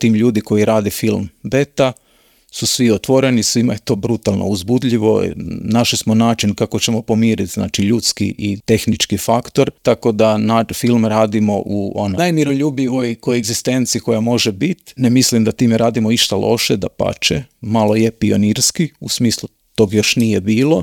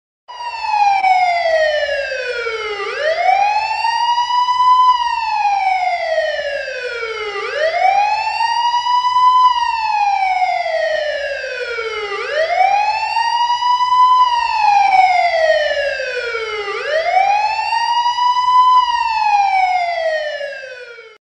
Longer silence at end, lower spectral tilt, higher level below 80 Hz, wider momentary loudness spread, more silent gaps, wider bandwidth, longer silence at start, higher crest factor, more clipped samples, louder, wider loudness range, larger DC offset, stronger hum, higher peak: second, 0 s vs 0.15 s; first, -4.5 dB/octave vs -0.5 dB/octave; first, -48 dBFS vs -54 dBFS; second, 6 LU vs 10 LU; neither; first, 19 kHz vs 9.8 kHz; second, 0 s vs 0.3 s; about the same, 14 dB vs 14 dB; neither; about the same, -15 LUFS vs -15 LUFS; about the same, 2 LU vs 4 LU; neither; neither; about the same, 0 dBFS vs -2 dBFS